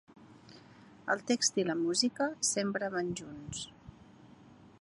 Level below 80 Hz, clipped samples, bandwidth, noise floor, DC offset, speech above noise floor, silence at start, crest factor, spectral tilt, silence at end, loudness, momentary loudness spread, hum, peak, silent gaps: -68 dBFS; under 0.1%; 11.5 kHz; -57 dBFS; under 0.1%; 24 dB; 0.15 s; 20 dB; -2.5 dB/octave; 0.15 s; -32 LUFS; 13 LU; none; -14 dBFS; none